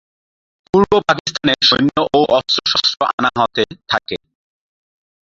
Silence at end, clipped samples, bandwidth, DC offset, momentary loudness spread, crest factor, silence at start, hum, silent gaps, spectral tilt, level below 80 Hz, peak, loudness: 1.1 s; under 0.1%; 7.8 kHz; under 0.1%; 8 LU; 18 dB; 0.75 s; none; 1.20-1.25 s, 3.13-3.18 s; -4 dB/octave; -48 dBFS; 0 dBFS; -15 LUFS